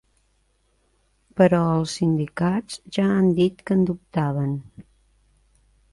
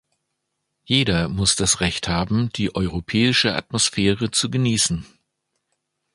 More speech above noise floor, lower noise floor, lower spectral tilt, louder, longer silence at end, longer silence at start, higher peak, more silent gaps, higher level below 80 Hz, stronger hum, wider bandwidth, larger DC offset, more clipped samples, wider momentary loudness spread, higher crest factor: second, 45 dB vs 56 dB; second, -66 dBFS vs -77 dBFS; first, -7 dB/octave vs -3.5 dB/octave; about the same, -22 LUFS vs -20 LUFS; about the same, 1.1 s vs 1.1 s; first, 1.35 s vs 0.9 s; about the same, -4 dBFS vs -2 dBFS; neither; second, -54 dBFS vs -42 dBFS; neither; about the same, 11.5 kHz vs 11.5 kHz; neither; neither; first, 10 LU vs 6 LU; about the same, 20 dB vs 20 dB